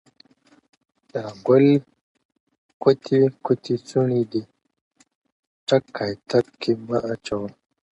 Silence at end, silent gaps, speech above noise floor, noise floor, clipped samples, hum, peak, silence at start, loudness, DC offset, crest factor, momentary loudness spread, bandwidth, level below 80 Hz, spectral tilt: 0.45 s; 2.01-2.15 s, 2.25-2.29 s, 2.40-2.47 s, 2.58-2.80 s, 4.81-4.91 s, 5.15-5.22 s, 5.32-5.67 s; 35 dB; -56 dBFS; under 0.1%; none; -4 dBFS; 1.15 s; -22 LUFS; under 0.1%; 20 dB; 13 LU; 8.4 kHz; -62 dBFS; -7.5 dB/octave